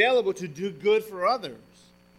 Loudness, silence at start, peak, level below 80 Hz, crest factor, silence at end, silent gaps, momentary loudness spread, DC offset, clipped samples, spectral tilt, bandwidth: -26 LUFS; 0 s; -8 dBFS; -68 dBFS; 18 dB; 0.6 s; none; 9 LU; under 0.1%; under 0.1%; -4.5 dB/octave; 14.5 kHz